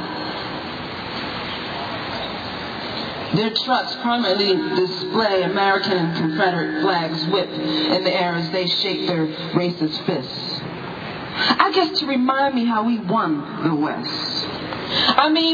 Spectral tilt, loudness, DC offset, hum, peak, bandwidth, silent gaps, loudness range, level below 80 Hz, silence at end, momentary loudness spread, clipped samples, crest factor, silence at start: -6 dB/octave; -21 LUFS; under 0.1%; none; -2 dBFS; 5 kHz; none; 4 LU; -54 dBFS; 0 s; 10 LU; under 0.1%; 20 dB; 0 s